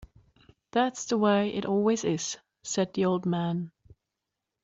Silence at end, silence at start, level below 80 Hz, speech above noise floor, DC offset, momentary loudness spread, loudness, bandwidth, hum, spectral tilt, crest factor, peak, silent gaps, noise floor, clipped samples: 0.95 s; 0 s; -64 dBFS; 59 dB; under 0.1%; 10 LU; -28 LUFS; 7.8 kHz; none; -5 dB/octave; 18 dB; -12 dBFS; none; -86 dBFS; under 0.1%